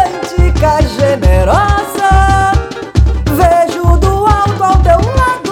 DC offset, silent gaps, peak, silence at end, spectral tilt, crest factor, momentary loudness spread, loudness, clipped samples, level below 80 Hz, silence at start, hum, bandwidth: under 0.1%; none; 0 dBFS; 0 s; -6.5 dB/octave; 10 dB; 4 LU; -10 LUFS; 0.4%; -14 dBFS; 0 s; none; 17 kHz